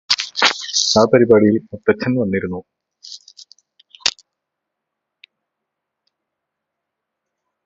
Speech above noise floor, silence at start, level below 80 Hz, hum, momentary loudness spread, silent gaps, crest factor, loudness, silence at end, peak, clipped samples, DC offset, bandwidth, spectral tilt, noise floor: 65 dB; 0.1 s; -54 dBFS; none; 22 LU; none; 20 dB; -16 LUFS; 3.55 s; 0 dBFS; under 0.1%; under 0.1%; 8 kHz; -3.5 dB/octave; -80 dBFS